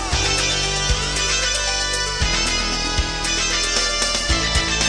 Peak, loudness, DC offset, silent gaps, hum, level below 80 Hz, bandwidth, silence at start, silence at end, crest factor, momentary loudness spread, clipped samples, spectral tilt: -6 dBFS; -18 LUFS; 0.1%; none; none; -28 dBFS; 10.5 kHz; 0 s; 0 s; 14 dB; 3 LU; under 0.1%; -1.5 dB/octave